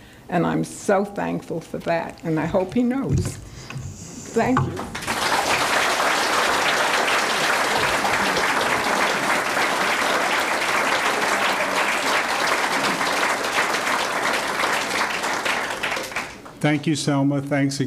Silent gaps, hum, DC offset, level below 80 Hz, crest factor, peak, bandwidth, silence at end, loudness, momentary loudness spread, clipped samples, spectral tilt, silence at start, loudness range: none; none; under 0.1%; -50 dBFS; 16 dB; -6 dBFS; 16 kHz; 0 s; -21 LUFS; 8 LU; under 0.1%; -3.5 dB/octave; 0 s; 5 LU